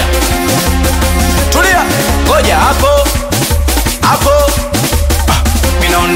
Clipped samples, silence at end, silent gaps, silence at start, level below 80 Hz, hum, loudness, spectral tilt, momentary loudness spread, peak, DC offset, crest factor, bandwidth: under 0.1%; 0 s; none; 0 s; -14 dBFS; none; -10 LUFS; -4 dB/octave; 4 LU; 0 dBFS; under 0.1%; 10 dB; 16.5 kHz